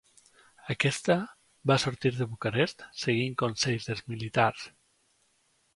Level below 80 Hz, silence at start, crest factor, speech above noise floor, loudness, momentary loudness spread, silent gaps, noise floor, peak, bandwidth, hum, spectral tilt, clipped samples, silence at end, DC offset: -64 dBFS; 0.65 s; 22 dB; 42 dB; -29 LUFS; 10 LU; none; -70 dBFS; -8 dBFS; 11.5 kHz; none; -5 dB/octave; under 0.1%; 1.05 s; under 0.1%